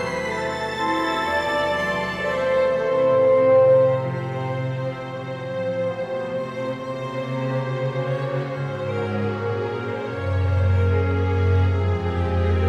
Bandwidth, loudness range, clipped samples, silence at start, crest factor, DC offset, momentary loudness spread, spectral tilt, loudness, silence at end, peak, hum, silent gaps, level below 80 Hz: 10 kHz; 8 LU; under 0.1%; 0 s; 14 dB; under 0.1%; 11 LU; -7 dB/octave; -22 LUFS; 0 s; -8 dBFS; none; none; -42 dBFS